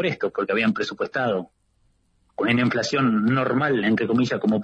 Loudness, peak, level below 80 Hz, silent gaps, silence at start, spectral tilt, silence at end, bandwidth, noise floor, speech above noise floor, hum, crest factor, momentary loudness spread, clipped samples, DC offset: -22 LUFS; -10 dBFS; -60 dBFS; none; 0 s; -6 dB/octave; 0 s; 8 kHz; -65 dBFS; 43 dB; none; 14 dB; 6 LU; under 0.1%; under 0.1%